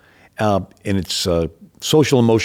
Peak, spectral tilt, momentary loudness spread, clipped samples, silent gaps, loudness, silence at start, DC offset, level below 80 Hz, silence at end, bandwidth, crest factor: -4 dBFS; -5 dB/octave; 13 LU; under 0.1%; none; -19 LUFS; 0.4 s; under 0.1%; -48 dBFS; 0 s; 17.5 kHz; 14 dB